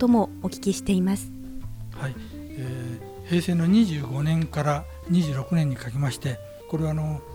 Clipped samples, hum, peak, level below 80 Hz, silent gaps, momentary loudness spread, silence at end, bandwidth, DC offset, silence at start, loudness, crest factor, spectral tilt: under 0.1%; none; -10 dBFS; -46 dBFS; none; 17 LU; 0 s; 17 kHz; under 0.1%; 0 s; -26 LUFS; 14 dB; -7 dB/octave